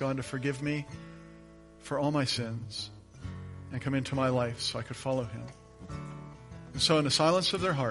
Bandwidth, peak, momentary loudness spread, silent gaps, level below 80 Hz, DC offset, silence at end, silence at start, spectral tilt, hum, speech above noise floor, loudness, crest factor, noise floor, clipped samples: 11.5 kHz; -12 dBFS; 22 LU; none; -56 dBFS; under 0.1%; 0 s; 0 s; -4.5 dB/octave; none; 22 dB; -30 LUFS; 20 dB; -53 dBFS; under 0.1%